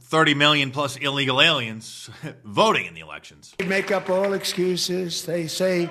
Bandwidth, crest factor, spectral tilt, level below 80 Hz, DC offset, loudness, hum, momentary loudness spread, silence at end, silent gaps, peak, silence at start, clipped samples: 13.5 kHz; 22 dB; -3.5 dB/octave; -64 dBFS; under 0.1%; -21 LUFS; none; 20 LU; 0 s; none; -2 dBFS; 0.1 s; under 0.1%